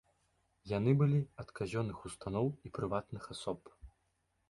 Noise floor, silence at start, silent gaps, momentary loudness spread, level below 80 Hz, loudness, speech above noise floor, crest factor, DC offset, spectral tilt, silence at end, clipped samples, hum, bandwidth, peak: -79 dBFS; 0.65 s; none; 14 LU; -60 dBFS; -37 LUFS; 44 dB; 20 dB; under 0.1%; -7.5 dB/octave; 0.6 s; under 0.1%; none; 11.5 kHz; -18 dBFS